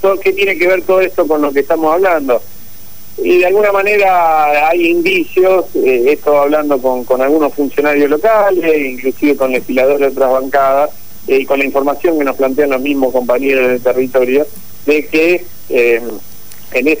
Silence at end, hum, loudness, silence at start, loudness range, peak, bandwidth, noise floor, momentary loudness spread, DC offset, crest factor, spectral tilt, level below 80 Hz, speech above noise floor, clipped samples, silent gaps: 0 s; none; -12 LUFS; 0.05 s; 2 LU; 0 dBFS; 16 kHz; -36 dBFS; 5 LU; 5%; 12 dB; -4.5 dB/octave; -50 dBFS; 24 dB; under 0.1%; none